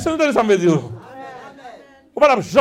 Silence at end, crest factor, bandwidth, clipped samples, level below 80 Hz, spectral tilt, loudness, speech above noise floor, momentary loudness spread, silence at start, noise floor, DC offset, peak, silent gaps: 0 s; 18 dB; 15 kHz; under 0.1%; -52 dBFS; -5.5 dB/octave; -16 LUFS; 27 dB; 21 LU; 0 s; -42 dBFS; under 0.1%; 0 dBFS; none